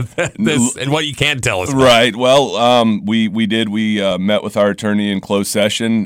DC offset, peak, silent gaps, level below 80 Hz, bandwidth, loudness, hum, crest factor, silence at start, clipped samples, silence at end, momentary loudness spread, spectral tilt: under 0.1%; -2 dBFS; none; -46 dBFS; 16 kHz; -14 LUFS; none; 12 dB; 0 s; under 0.1%; 0 s; 6 LU; -4.5 dB/octave